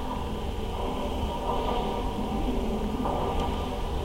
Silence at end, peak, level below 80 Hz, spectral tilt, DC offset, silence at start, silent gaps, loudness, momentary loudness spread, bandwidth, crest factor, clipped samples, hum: 0 s; -14 dBFS; -34 dBFS; -6.5 dB/octave; under 0.1%; 0 s; none; -31 LUFS; 4 LU; 16.5 kHz; 14 dB; under 0.1%; none